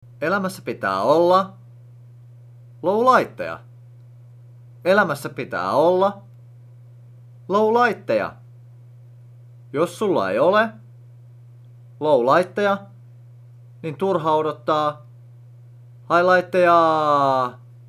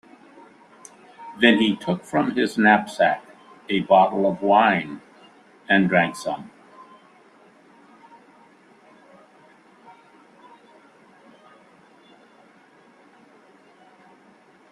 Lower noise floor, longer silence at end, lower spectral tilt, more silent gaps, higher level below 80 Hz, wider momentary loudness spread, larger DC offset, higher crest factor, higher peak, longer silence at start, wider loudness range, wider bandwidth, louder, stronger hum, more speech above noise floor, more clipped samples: second, -44 dBFS vs -54 dBFS; second, 0.35 s vs 8.25 s; about the same, -6 dB/octave vs -5.5 dB/octave; neither; about the same, -68 dBFS vs -68 dBFS; second, 12 LU vs 17 LU; neither; about the same, 20 dB vs 22 dB; about the same, -2 dBFS vs -2 dBFS; second, 0.2 s vs 1.2 s; about the same, 5 LU vs 6 LU; first, 14.5 kHz vs 13 kHz; about the same, -20 LUFS vs -20 LUFS; neither; second, 26 dB vs 34 dB; neither